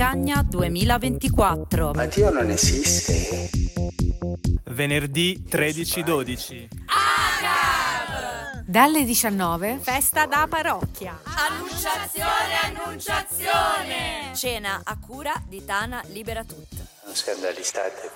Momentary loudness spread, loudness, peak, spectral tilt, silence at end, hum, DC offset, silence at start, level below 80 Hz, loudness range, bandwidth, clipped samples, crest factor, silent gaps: 12 LU; -23 LUFS; -2 dBFS; -3.5 dB/octave; 0 s; none; under 0.1%; 0 s; -34 dBFS; 6 LU; 17 kHz; under 0.1%; 20 dB; none